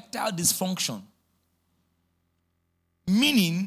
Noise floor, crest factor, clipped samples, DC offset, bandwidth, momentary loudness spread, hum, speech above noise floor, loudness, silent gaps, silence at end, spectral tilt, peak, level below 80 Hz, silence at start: -74 dBFS; 16 dB; under 0.1%; under 0.1%; 16 kHz; 13 LU; none; 49 dB; -24 LUFS; none; 0 s; -3.5 dB/octave; -12 dBFS; -64 dBFS; 0.15 s